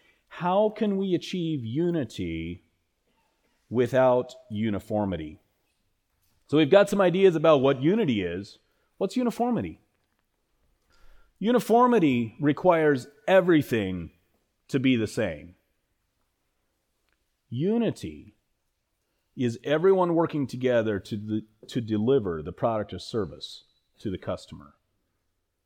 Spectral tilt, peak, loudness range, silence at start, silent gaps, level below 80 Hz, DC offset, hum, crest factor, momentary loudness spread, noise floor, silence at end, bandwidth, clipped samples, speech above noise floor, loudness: -7 dB/octave; -6 dBFS; 10 LU; 0.3 s; none; -58 dBFS; under 0.1%; none; 20 dB; 15 LU; -76 dBFS; 1.05 s; 18.5 kHz; under 0.1%; 52 dB; -25 LUFS